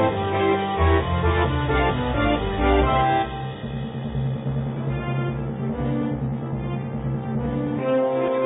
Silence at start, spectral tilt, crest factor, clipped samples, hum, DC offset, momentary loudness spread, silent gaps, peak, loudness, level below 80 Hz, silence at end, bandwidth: 0 s; -12 dB/octave; 18 dB; under 0.1%; none; under 0.1%; 8 LU; none; -4 dBFS; -23 LUFS; -32 dBFS; 0 s; 4 kHz